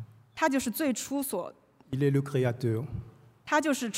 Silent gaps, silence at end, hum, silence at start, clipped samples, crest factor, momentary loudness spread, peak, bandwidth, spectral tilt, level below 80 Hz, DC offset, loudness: none; 0 s; none; 0 s; under 0.1%; 18 dB; 15 LU; -12 dBFS; 16 kHz; -5.5 dB/octave; -60 dBFS; under 0.1%; -30 LUFS